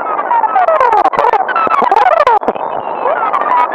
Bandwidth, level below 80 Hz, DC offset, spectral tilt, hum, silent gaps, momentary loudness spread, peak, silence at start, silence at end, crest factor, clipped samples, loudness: 10 kHz; -52 dBFS; under 0.1%; -4.5 dB/octave; none; none; 7 LU; 0 dBFS; 0 s; 0 s; 12 dB; 0.2%; -11 LUFS